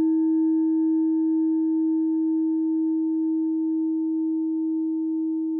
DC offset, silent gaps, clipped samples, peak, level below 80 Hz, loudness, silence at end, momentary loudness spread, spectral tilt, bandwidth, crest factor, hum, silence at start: under 0.1%; none; under 0.1%; -16 dBFS; under -90 dBFS; -24 LUFS; 0 s; 4 LU; -11.5 dB/octave; 1.8 kHz; 6 dB; none; 0 s